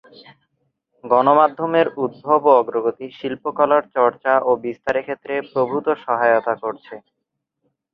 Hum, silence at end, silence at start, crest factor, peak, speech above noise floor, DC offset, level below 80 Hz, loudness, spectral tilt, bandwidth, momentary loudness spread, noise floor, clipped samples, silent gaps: none; 0.95 s; 1.05 s; 18 dB; 0 dBFS; 59 dB; under 0.1%; -64 dBFS; -19 LUFS; -7.5 dB/octave; 6 kHz; 11 LU; -78 dBFS; under 0.1%; none